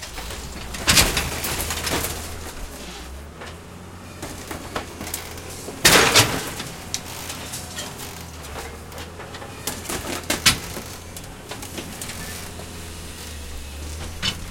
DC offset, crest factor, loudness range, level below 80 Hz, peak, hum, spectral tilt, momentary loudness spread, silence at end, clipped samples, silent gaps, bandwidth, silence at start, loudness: under 0.1%; 26 dB; 13 LU; -40 dBFS; 0 dBFS; none; -2 dB/octave; 20 LU; 0 s; under 0.1%; none; 17 kHz; 0 s; -22 LUFS